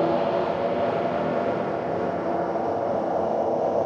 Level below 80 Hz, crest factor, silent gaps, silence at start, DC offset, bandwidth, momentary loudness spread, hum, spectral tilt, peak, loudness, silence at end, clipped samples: -60 dBFS; 12 dB; none; 0 s; under 0.1%; 7.4 kHz; 3 LU; none; -7.5 dB/octave; -12 dBFS; -25 LUFS; 0 s; under 0.1%